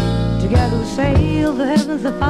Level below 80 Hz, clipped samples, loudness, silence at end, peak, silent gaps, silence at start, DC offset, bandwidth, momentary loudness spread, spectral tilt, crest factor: -26 dBFS; under 0.1%; -17 LUFS; 0 s; -4 dBFS; none; 0 s; under 0.1%; 12.5 kHz; 3 LU; -7 dB/octave; 12 dB